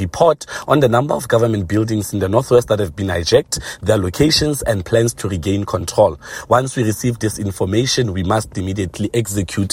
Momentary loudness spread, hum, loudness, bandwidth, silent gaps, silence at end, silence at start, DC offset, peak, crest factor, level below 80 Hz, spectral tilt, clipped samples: 7 LU; none; -17 LUFS; 16.5 kHz; none; 0 s; 0 s; under 0.1%; 0 dBFS; 16 dB; -40 dBFS; -5 dB/octave; under 0.1%